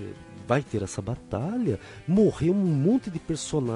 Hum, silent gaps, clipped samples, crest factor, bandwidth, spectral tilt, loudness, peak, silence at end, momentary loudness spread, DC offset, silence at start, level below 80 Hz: none; none; under 0.1%; 16 dB; 11.5 kHz; -7 dB/octave; -26 LUFS; -10 dBFS; 0 s; 11 LU; under 0.1%; 0 s; -50 dBFS